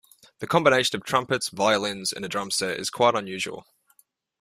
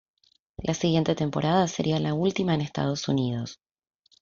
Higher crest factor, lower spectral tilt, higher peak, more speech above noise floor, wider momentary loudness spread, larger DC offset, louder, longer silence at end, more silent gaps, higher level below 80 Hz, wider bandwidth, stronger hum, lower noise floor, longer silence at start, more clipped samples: about the same, 22 dB vs 18 dB; second, -3 dB/octave vs -6 dB/octave; first, -4 dBFS vs -8 dBFS; first, 39 dB vs 20 dB; first, 11 LU vs 7 LU; neither; about the same, -24 LUFS vs -26 LUFS; about the same, 0.8 s vs 0.7 s; neither; second, -64 dBFS vs -56 dBFS; first, 16 kHz vs 7.6 kHz; neither; first, -63 dBFS vs -45 dBFS; second, 0.4 s vs 0.6 s; neither